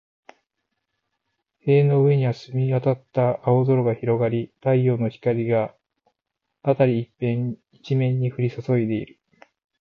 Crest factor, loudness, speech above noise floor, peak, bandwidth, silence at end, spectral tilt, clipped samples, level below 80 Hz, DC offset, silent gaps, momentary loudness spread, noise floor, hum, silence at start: 16 dB; -22 LUFS; 60 dB; -6 dBFS; 6 kHz; 0.75 s; -10 dB/octave; under 0.1%; -62 dBFS; under 0.1%; none; 9 LU; -81 dBFS; none; 1.65 s